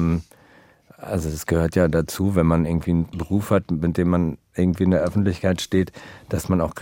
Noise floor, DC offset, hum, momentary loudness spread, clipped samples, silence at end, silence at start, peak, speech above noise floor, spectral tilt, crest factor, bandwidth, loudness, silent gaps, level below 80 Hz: -53 dBFS; under 0.1%; none; 9 LU; under 0.1%; 0 s; 0 s; -4 dBFS; 32 dB; -7 dB/octave; 18 dB; 17 kHz; -22 LUFS; none; -42 dBFS